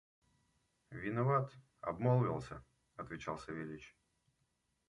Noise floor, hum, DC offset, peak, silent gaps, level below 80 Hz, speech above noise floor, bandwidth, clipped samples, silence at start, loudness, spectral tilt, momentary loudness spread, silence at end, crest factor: -82 dBFS; none; under 0.1%; -20 dBFS; none; -68 dBFS; 44 dB; 10.5 kHz; under 0.1%; 0.9 s; -38 LUFS; -8.5 dB/octave; 19 LU; 1 s; 20 dB